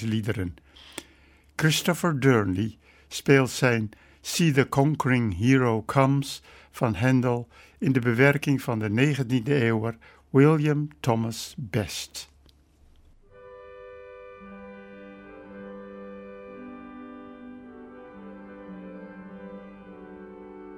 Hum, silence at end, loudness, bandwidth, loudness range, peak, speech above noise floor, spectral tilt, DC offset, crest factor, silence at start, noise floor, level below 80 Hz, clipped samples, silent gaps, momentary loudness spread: none; 0 s; -24 LUFS; 16.5 kHz; 20 LU; -6 dBFS; 34 dB; -6 dB/octave; under 0.1%; 22 dB; 0 s; -58 dBFS; -56 dBFS; under 0.1%; none; 24 LU